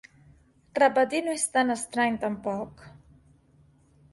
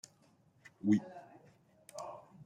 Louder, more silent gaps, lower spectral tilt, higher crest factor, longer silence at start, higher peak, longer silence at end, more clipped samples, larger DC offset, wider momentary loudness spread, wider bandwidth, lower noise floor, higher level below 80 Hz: first, -26 LUFS vs -37 LUFS; neither; second, -3.5 dB/octave vs -7 dB/octave; about the same, 20 dB vs 22 dB; about the same, 0.75 s vs 0.85 s; first, -10 dBFS vs -18 dBFS; first, 1.15 s vs 0 s; neither; neither; second, 13 LU vs 24 LU; second, 11.5 kHz vs 15 kHz; second, -60 dBFS vs -69 dBFS; first, -64 dBFS vs -84 dBFS